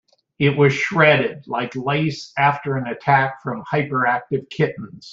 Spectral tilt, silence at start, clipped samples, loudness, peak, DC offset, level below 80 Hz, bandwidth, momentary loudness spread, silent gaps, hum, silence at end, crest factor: -6.5 dB/octave; 0.4 s; under 0.1%; -19 LUFS; -2 dBFS; under 0.1%; -58 dBFS; 7.6 kHz; 10 LU; none; none; 0 s; 18 dB